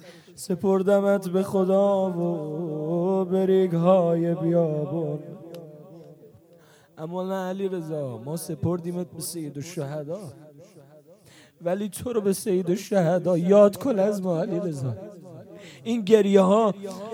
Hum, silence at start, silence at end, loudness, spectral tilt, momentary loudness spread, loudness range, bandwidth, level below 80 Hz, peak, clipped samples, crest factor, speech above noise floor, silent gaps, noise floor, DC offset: none; 0.05 s; 0 s; -24 LUFS; -7 dB/octave; 17 LU; 10 LU; 17 kHz; -66 dBFS; -4 dBFS; under 0.1%; 20 dB; 31 dB; none; -54 dBFS; under 0.1%